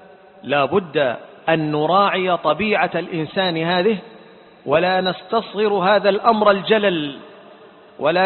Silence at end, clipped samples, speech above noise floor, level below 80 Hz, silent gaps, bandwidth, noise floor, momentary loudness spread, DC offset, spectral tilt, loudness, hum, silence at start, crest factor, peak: 0 s; under 0.1%; 27 dB; -60 dBFS; none; 4.4 kHz; -45 dBFS; 9 LU; under 0.1%; -10.5 dB/octave; -18 LUFS; none; 0.45 s; 18 dB; 0 dBFS